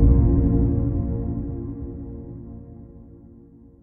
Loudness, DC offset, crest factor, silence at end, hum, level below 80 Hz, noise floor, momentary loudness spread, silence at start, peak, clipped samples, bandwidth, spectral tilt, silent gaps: -23 LUFS; under 0.1%; 18 dB; 0.8 s; none; -26 dBFS; -48 dBFS; 23 LU; 0 s; -4 dBFS; under 0.1%; 2 kHz; -15.5 dB/octave; none